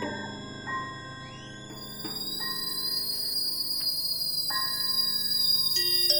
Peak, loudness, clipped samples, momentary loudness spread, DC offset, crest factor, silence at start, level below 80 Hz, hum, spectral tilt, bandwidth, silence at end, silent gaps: -10 dBFS; -26 LUFS; under 0.1%; 18 LU; 0.1%; 20 dB; 0 s; -62 dBFS; none; -1 dB/octave; over 20 kHz; 0 s; none